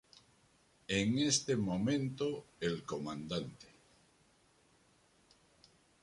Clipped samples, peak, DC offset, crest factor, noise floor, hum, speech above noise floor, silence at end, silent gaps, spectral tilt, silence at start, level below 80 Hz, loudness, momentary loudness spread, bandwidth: under 0.1%; -18 dBFS; under 0.1%; 20 dB; -70 dBFS; none; 34 dB; 2.35 s; none; -4 dB/octave; 0.9 s; -66 dBFS; -36 LUFS; 10 LU; 11.5 kHz